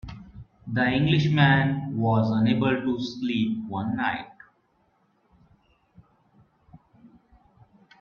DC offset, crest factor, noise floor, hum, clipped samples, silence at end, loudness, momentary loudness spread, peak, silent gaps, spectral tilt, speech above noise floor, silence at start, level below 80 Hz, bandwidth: under 0.1%; 22 dB; -67 dBFS; none; under 0.1%; 0.95 s; -24 LUFS; 15 LU; -6 dBFS; none; -7.5 dB/octave; 44 dB; 0.05 s; -54 dBFS; 6.8 kHz